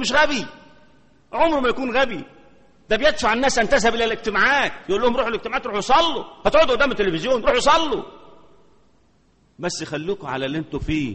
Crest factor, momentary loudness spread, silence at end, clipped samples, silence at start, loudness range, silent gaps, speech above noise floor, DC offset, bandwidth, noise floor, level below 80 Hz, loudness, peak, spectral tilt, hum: 18 dB; 10 LU; 0 s; under 0.1%; 0 s; 4 LU; none; 40 dB; under 0.1%; 8.8 kHz; -59 dBFS; -40 dBFS; -20 LUFS; -4 dBFS; -3.5 dB/octave; none